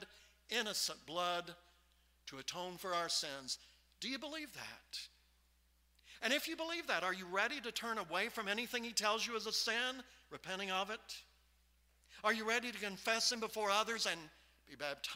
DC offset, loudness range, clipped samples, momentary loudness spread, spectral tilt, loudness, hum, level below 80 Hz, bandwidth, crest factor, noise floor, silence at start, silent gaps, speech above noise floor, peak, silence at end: under 0.1%; 5 LU; under 0.1%; 13 LU; -1 dB/octave; -39 LUFS; none; -74 dBFS; 16 kHz; 24 dB; -73 dBFS; 0 s; none; 33 dB; -18 dBFS; 0 s